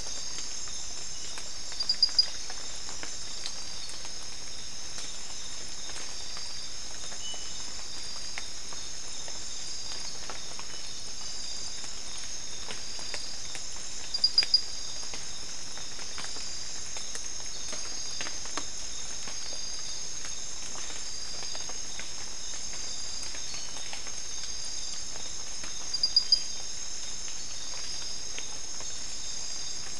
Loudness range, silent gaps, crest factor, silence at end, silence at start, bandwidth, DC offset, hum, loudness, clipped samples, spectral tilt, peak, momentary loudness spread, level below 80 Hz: 7 LU; none; 24 dB; 0 s; 0 s; 12 kHz; 3%; none; -33 LUFS; under 0.1%; 0.5 dB/octave; -10 dBFS; 11 LU; -54 dBFS